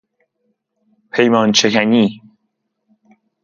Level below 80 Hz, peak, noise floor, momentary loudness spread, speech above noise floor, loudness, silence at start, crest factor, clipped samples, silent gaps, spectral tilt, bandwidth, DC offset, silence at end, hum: -62 dBFS; 0 dBFS; -71 dBFS; 7 LU; 58 dB; -14 LUFS; 1.15 s; 18 dB; under 0.1%; none; -4 dB/octave; 7.4 kHz; under 0.1%; 1.25 s; none